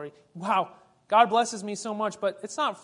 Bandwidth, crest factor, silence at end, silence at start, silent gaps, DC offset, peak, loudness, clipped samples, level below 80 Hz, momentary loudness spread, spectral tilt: 11 kHz; 20 dB; 0.05 s; 0 s; none; under 0.1%; -8 dBFS; -26 LUFS; under 0.1%; -80 dBFS; 15 LU; -3.5 dB/octave